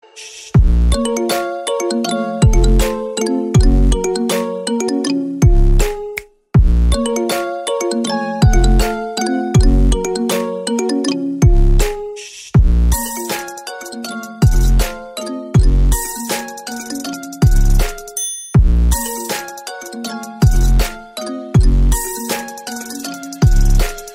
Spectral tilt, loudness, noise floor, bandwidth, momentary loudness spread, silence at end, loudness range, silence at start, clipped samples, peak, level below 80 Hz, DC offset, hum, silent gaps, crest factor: -5.5 dB/octave; -17 LUFS; -35 dBFS; 16.5 kHz; 13 LU; 0 s; 2 LU; 0.15 s; under 0.1%; -2 dBFS; -16 dBFS; under 0.1%; none; none; 12 dB